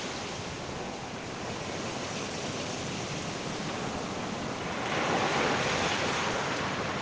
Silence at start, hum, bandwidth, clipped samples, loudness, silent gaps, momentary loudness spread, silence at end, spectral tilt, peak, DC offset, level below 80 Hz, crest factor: 0 s; none; 10 kHz; under 0.1%; -32 LUFS; none; 9 LU; 0 s; -3.5 dB/octave; -16 dBFS; under 0.1%; -56 dBFS; 18 dB